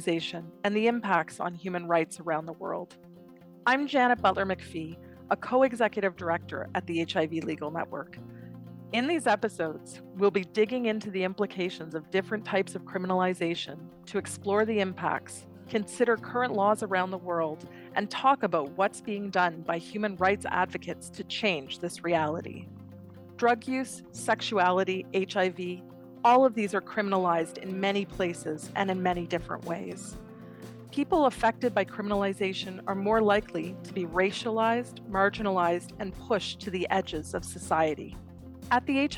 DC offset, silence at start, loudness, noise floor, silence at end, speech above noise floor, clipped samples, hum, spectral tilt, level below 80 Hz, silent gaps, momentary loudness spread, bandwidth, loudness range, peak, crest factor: under 0.1%; 0 s; -29 LUFS; -51 dBFS; 0 s; 23 dB; under 0.1%; none; -5 dB/octave; -58 dBFS; none; 14 LU; 17 kHz; 4 LU; -10 dBFS; 18 dB